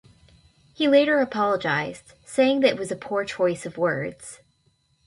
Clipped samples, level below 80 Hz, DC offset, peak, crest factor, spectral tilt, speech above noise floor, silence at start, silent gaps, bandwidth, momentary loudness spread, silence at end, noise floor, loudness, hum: under 0.1%; -62 dBFS; under 0.1%; -6 dBFS; 18 dB; -5 dB/octave; 43 dB; 0.8 s; none; 11.5 kHz; 15 LU; 0.7 s; -66 dBFS; -23 LUFS; none